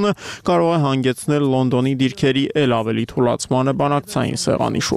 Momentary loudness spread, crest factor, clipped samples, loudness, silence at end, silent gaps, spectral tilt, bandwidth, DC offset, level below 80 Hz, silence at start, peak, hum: 3 LU; 14 dB; under 0.1%; -18 LUFS; 0 s; none; -5.5 dB/octave; 14.5 kHz; under 0.1%; -50 dBFS; 0 s; -4 dBFS; none